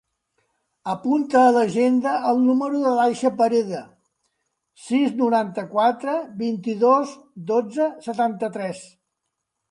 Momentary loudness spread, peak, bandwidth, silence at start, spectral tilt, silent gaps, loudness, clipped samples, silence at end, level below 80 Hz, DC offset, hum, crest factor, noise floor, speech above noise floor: 12 LU; -4 dBFS; 11 kHz; 0.85 s; -6 dB/octave; none; -21 LUFS; under 0.1%; 0.85 s; -72 dBFS; under 0.1%; none; 18 dB; -79 dBFS; 59 dB